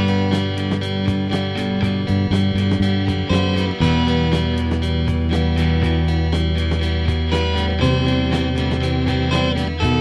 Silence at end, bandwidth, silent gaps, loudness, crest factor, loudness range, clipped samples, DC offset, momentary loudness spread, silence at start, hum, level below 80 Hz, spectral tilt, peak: 0 s; 10.5 kHz; none; -19 LUFS; 16 dB; 1 LU; under 0.1%; under 0.1%; 3 LU; 0 s; none; -26 dBFS; -7 dB/octave; -2 dBFS